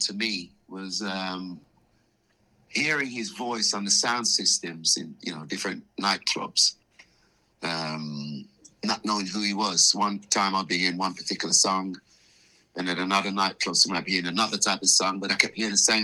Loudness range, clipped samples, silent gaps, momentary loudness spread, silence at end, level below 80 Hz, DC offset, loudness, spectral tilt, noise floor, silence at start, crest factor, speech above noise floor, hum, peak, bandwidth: 5 LU; under 0.1%; none; 14 LU; 0 s; -72 dBFS; under 0.1%; -24 LUFS; -1.5 dB/octave; -67 dBFS; 0 s; 26 dB; 41 dB; none; -2 dBFS; 13.5 kHz